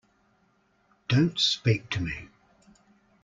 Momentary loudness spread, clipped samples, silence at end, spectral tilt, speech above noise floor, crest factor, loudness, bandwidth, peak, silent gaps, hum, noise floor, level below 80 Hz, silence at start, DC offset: 15 LU; under 0.1%; 1 s; -5 dB/octave; 42 dB; 20 dB; -26 LUFS; 7.8 kHz; -10 dBFS; none; none; -67 dBFS; -56 dBFS; 1.1 s; under 0.1%